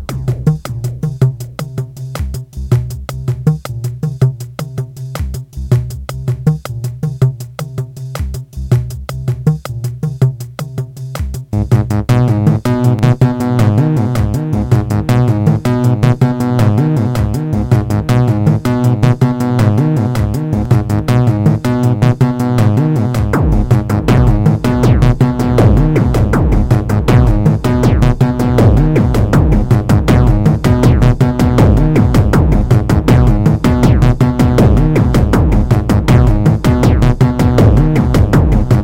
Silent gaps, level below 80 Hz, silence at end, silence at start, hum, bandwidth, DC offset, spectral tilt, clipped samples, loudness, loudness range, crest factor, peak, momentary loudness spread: none; -20 dBFS; 0 s; 0 s; none; 16.5 kHz; under 0.1%; -8 dB/octave; under 0.1%; -12 LUFS; 8 LU; 10 dB; 0 dBFS; 12 LU